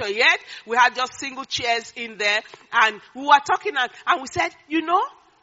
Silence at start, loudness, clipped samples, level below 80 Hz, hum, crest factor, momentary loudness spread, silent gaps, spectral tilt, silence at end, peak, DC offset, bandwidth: 0 s; -21 LUFS; under 0.1%; -66 dBFS; none; 22 dB; 10 LU; none; 1 dB/octave; 0.3 s; 0 dBFS; under 0.1%; 8 kHz